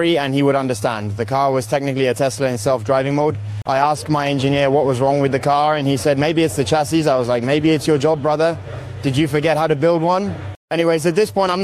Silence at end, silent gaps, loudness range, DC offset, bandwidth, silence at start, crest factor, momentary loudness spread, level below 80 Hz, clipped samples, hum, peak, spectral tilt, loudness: 0 s; 10.56-10.68 s; 2 LU; under 0.1%; 15 kHz; 0 s; 14 dB; 5 LU; -48 dBFS; under 0.1%; none; -2 dBFS; -6 dB/octave; -17 LUFS